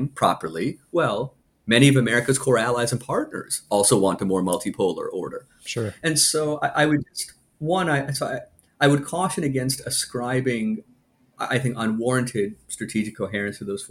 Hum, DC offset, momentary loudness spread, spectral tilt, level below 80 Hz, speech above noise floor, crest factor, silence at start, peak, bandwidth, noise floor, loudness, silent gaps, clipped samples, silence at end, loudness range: none; under 0.1%; 13 LU; -4.5 dB/octave; -58 dBFS; 37 dB; 22 dB; 0 s; -2 dBFS; 16 kHz; -59 dBFS; -23 LUFS; none; under 0.1%; 0.05 s; 5 LU